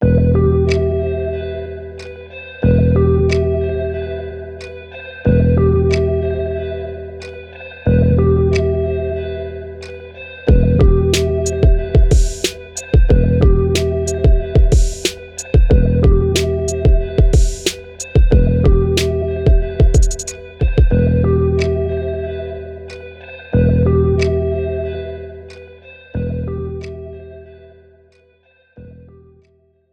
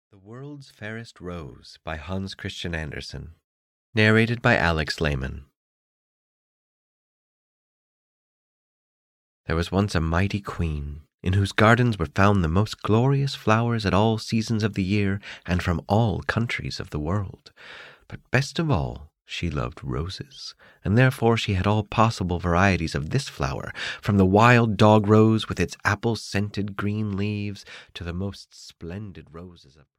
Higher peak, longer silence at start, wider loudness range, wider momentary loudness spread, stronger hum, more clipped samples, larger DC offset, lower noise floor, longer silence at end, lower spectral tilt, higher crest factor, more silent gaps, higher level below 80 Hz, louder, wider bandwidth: first, 0 dBFS vs -4 dBFS; second, 0 s vs 0.25 s; second, 7 LU vs 11 LU; second, 18 LU vs 21 LU; neither; neither; neither; second, -56 dBFS vs under -90 dBFS; first, 1 s vs 0.45 s; about the same, -6.5 dB/octave vs -6.5 dB/octave; second, 14 dB vs 20 dB; second, none vs 3.44-3.93 s, 5.57-9.44 s, 11.14-11.18 s; first, -18 dBFS vs -42 dBFS; first, -16 LUFS vs -23 LUFS; about the same, 14 kHz vs 13.5 kHz